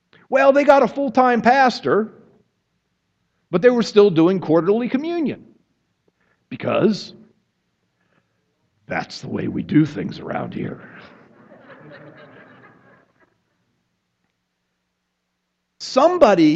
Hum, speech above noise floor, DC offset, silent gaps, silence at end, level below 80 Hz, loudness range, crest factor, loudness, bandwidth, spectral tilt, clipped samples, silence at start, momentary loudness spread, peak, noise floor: none; 58 dB; under 0.1%; none; 0 s; -62 dBFS; 9 LU; 20 dB; -18 LUFS; 8 kHz; -6.5 dB/octave; under 0.1%; 0.3 s; 15 LU; 0 dBFS; -74 dBFS